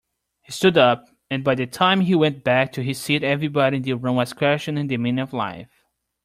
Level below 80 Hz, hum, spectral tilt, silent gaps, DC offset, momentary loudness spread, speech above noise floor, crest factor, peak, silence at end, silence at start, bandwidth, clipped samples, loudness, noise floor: -60 dBFS; none; -5.5 dB/octave; none; under 0.1%; 10 LU; 48 dB; 18 dB; -4 dBFS; 0.6 s; 0.5 s; 15.5 kHz; under 0.1%; -21 LUFS; -68 dBFS